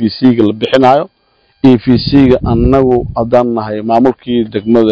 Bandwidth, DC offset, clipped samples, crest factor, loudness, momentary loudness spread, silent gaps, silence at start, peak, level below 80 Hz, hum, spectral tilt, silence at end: 7.6 kHz; under 0.1%; 2%; 10 dB; -10 LUFS; 6 LU; none; 0 s; 0 dBFS; -28 dBFS; none; -8.5 dB/octave; 0 s